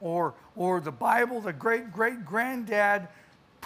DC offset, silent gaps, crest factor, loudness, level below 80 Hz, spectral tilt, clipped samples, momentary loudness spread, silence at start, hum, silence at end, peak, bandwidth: under 0.1%; none; 18 dB; -28 LUFS; -72 dBFS; -6 dB/octave; under 0.1%; 6 LU; 0 s; none; 0 s; -10 dBFS; 15.5 kHz